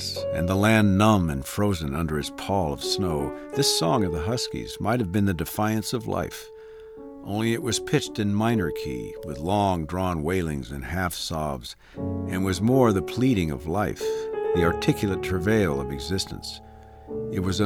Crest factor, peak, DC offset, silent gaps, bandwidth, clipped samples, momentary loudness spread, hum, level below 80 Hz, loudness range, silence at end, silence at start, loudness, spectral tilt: 20 dB; -6 dBFS; under 0.1%; none; 19 kHz; under 0.1%; 13 LU; none; -44 dBFS; 4 LU; 0 s; 0 s; -25 LUFS; -5.5 dB/octave